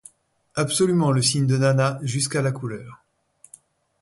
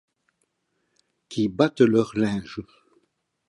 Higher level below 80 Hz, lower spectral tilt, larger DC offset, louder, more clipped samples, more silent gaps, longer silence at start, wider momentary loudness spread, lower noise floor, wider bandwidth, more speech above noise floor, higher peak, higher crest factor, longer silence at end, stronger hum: about the same, -60 dBFS vs -60 dBFS; second, -5 dB/octave vs -7 dB/octave; neither; about the same, -22 LUFS vs -23 LUFS; neither; neither; second, 0.55 s vs 1.3 s; second, 13 LU vs 17 LU; second, -59 dBFS vs -74 dBFS; about the same, 11.5 kHz vs 11 kHz; second, 38 dB vs 52 dB; second, -8 dBFS vs -4 dBFS; second, 16 dB vs 22 dB; first, 1.05 s vs 0.85 s; neither